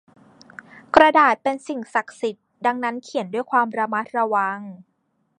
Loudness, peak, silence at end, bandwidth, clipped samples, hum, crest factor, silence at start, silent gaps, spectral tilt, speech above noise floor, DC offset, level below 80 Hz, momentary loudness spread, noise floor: -21 LUFS; 0 dBFS; 0.65 s; 10.5 kHz; under 0.1%; none; 22 dB; 0.95 s; none; -4.5 dB/octave; 24 dB; under 0.1%; -60 dBFS; 15 LU; -45 dBFS